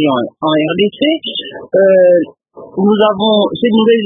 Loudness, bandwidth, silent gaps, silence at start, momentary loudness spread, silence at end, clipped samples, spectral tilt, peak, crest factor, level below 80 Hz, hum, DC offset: -12 LUFS; 3.9 kHz; none; 0 s; 11 LU; 0 s; under 0.1%; -10 dB/octave; 0 dBFS; 12 dB; -56 dBFS; none; under 0.1%